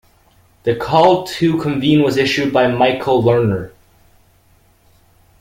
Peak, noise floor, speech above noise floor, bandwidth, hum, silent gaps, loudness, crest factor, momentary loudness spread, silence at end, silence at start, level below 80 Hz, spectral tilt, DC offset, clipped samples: 0 dBFS; -53 dBFS; 39 dB; 16.5 kHz; none; none; -15 LUFS; 16 dB; 8 LU; 1.75 s; 0.65 s; -48 dBFS; -6.5 dB/octave; under 0.1%; under 0.1%